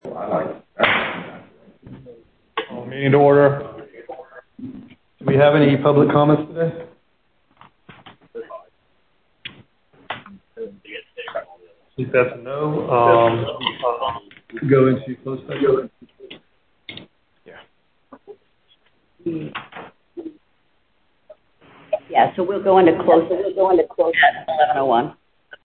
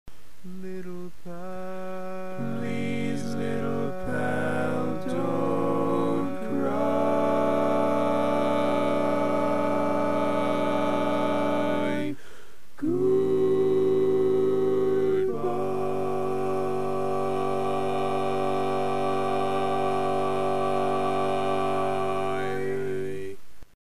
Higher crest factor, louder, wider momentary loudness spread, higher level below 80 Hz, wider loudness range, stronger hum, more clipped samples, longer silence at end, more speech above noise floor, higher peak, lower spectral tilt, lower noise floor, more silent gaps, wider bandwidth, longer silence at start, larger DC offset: first, 20 dB vs 14 dB; first, -18 LUFS vs -26 LUFS; first, 24 LU vs 11 LU; about the same, -60 dBFS vs -58 dBFS; first, 18 LU vs 5 LU; neither; neither; about the same, 0.1 s vs 0.15 s; first, 49 dB vs 20 dB; first, 0 dBFS vs -14 dBFS; first, -11 dB/octave vs -7 dB/octave; first, -66 dBFS vs -52 dBFS; neither; second, 4.5 kHz vs 14.5 kHz; about the same, 0.05 s vs 0.05 s; second, under 0.1% vs 3%